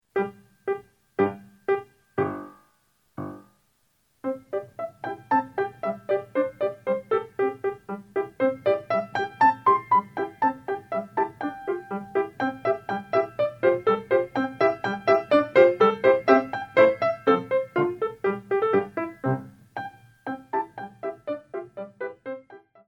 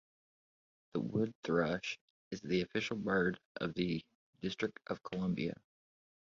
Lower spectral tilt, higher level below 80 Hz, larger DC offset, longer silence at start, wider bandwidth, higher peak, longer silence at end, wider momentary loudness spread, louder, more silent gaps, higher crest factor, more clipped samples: first, -7.5 dB/octave vs -5 dB/octave; about the same, -68 dBFS vs -66 dBFS; neither; second, 0.15 s vs 0.95 s; about the same, 8 kHz vs 7.4 kHz; first, -4 dBFS vs -20 dBFS; second, 0.3 s vs 0.8 s; first, 16 LU vs 10 LU; first, -25 LUFS vs -38 LUFS; second, none vs 1.35-1.43 s, 2.01-2.31 s, 3.45-3.55 s, 4.15-4.33 s; about the same, 22 dB vs 20 dB; neither